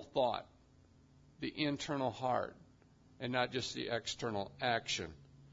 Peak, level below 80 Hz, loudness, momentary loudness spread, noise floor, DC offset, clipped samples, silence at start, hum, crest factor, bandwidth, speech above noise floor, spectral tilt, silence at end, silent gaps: -20 dBFS; -68 dBFS; -38 LUFS; 9 LU; -65 dBFS; under 0.1%; under 0.1%; 0 s; none; 20 dB; 7.4 kHz; 27 dB; -3 dB/octave; 0.05 s; none